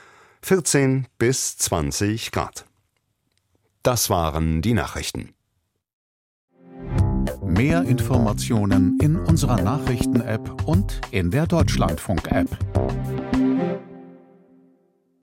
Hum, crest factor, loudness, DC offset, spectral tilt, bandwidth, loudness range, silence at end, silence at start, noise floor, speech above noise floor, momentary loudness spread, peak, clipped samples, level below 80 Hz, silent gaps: none; 18 dB; -22 LUFS; under 0.1%; -5.5 dB/octave; 16.5 kHz; 5 LU; 1.05 s; 0.45 s; -73 dBFS; 53 dB; 9 LU; -4 dBFS; under 0.1%; -34 dBFS; 5.93-6.48 s